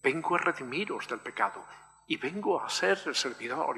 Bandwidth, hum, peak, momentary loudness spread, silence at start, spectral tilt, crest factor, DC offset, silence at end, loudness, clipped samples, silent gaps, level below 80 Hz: 13 kHz; none; -12 dBFS; 8 LU; 0.05 s; -3 dB/octave; 20 dB; under 0.1%; 0 s; -31 LUFS; under 0.1%; none; -76 dBFS